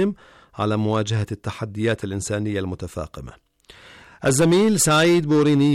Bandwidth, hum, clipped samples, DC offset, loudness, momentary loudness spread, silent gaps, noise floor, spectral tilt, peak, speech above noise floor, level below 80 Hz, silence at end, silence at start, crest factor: 17 kHz; none; under 0.1%; under 0.1%; -20 LUFS; 15 LU; none; -48 dBFS; -5 dB/octave; -8 dBFS; 28 dB; -50 dBFS; 0 s; 0 s; 12 dB